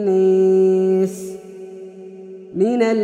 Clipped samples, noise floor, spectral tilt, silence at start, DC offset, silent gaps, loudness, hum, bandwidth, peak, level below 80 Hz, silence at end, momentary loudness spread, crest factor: under 0.1%; -36 dBFS; -7.5 dB/octave; 0 s; under 0.1%; none; -16 LUFS; none; 11.5 kHz; -6 dBFS; -66 dBFS; 0 s; 22 LU; 12 dB